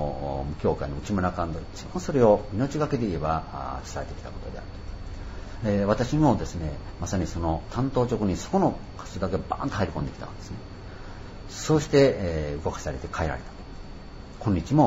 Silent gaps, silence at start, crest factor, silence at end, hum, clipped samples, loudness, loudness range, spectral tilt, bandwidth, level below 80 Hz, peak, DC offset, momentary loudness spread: none; 0 s; 20 dB; 0 s; none; under 0.1%; -27 LUFS; 4 LU; -6.5 dB/octave; 14 kHz; -40 dBFS; -6 dBFS; under 0.1%; 18 LU